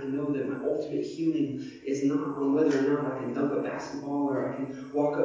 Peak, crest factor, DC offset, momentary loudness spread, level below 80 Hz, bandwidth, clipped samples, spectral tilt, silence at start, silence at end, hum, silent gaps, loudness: -14 dBFS; 16 dB; under 0.1%; 8 LU; -70 dBFS; 7.6 kHz; under 0.1%; -7 dB/octave; 0 s; 0 s; none; none; -29 LUFS